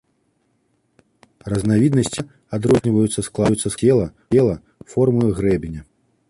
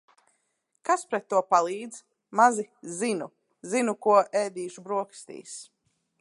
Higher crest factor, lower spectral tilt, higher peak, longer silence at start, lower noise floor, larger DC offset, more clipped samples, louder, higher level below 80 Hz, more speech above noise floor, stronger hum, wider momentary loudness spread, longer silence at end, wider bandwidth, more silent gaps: second, 16 dB vs 22 dB; first, -6.5 dB/octave vs -4 dB/octave; about the same, -4 dBFS vs -6 dBFS; first, 1.45 s vs 0.85 s; second, -66 dBFS vs -75 dBFS; neither; neither; first, -19 LUFS vs -26 LUFS; first, -44 dBFS vs -84 dBFS; about the same, 48 dB vs 49 dB; neither; second, 13 LU vs 20 LU; about the same, 0.5 s vs 0.6 s; about the same, 11.5 kHz vs 11.5 kHz; neither